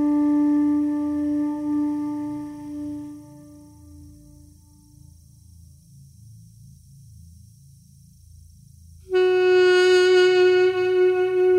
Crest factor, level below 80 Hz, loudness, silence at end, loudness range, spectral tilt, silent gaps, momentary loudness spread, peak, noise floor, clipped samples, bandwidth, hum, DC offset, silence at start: 14 dB; -56 dBFS; -20 LUFS; 0 s; 21 LU; -5 dB/octave; none; 18 LU; -8 dBFS; -51 dBFS; under 0.1%; 10.5 kHz; none; under 0.1%; 0 s